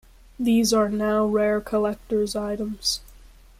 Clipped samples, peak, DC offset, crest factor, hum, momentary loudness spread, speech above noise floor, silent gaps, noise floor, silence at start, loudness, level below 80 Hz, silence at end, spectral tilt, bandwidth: under 0.1%; -10 dBFS; under 0.1%; 14 dB; none; 8 LU; 26 dB; none; -48 dBFS; 0.4 s; -23 LUFS; -48 dBFS; 0.45 s; -4 dB/octave; 15.5 kHz